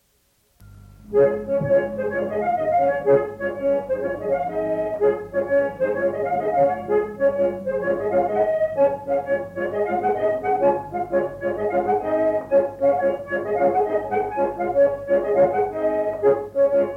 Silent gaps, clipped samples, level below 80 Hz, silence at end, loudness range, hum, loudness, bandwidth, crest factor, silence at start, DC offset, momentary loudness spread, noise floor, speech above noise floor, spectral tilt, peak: none; under 0.1%; -52 dBFS; 0 s; 2 LU; none; -22 LUFS; 3.7 kHz; 14 dB; 0.6 s; under 0.1%; 6 LU; -64 dBFS; 43 dB; -8.5 dB/octave; -8 dBFS